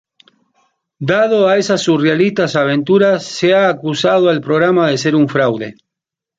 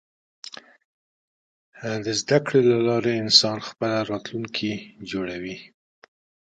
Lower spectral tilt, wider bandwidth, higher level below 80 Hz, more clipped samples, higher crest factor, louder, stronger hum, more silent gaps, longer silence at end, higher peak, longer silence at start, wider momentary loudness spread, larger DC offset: first, -5.5 dB/octave vs -4 dB/octave; about the same, 9 kHz vs 9.2 kHz; first, -58 dBFS vs -64 dBFS; neither; second, 12 dB vs 24 dB; first, -13 LUFS vs -22 LUFS; neither; second, none vs 0.85-1.72 s; second, 0.65 s vs 0.85 s; about the same, -2 dBFS vs -2 dBFS; first, 1 s vs 0.45 s; second, 4 LU vs 23 LU; neither